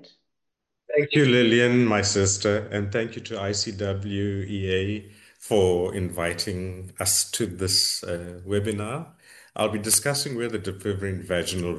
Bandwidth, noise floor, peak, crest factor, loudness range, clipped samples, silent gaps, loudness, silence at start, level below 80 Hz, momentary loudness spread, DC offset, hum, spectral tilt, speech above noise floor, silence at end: 13 kHz; -82 dBFS; -4 dBFS; 20 dB; 5 LU; under 0.1%; none; -24 LUFS; 0.9 s; -46 dBFS; 12 LU; under 0.1%; none; -3.5 dB/octave; 58 dB; 0 s